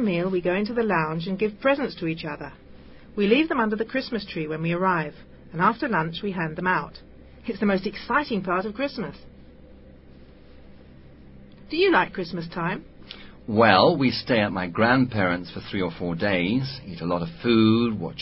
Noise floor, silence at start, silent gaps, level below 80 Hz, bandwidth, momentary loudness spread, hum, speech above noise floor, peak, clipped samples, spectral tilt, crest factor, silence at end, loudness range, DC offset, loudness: -47 dBFS; 0 s; none; -52 dBFS; 5.8 kHz; 14 LU; none; 24 dB; -2 dBFS; under 0.1%; -10.5 dB/octave; 22 dB; 0 s; 6 LU; under 0.1%; -24 LUFS